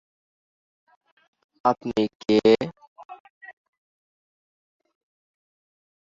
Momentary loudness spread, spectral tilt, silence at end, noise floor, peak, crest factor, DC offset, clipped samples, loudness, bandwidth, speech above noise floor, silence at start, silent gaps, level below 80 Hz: 26 LU; -6 dB/octave; 2.6 s; under -90 dBFS; -6 dBFS; 22 dB; under 0.1%; under 0.1%; -22 LUFS; 7.6 kHz; over 69 dB; 1.65 s; 2.15-2.20 s, 2.88-2.96 s, 3.05-3.09 s, 3.20-3.41 s; -66 dBFS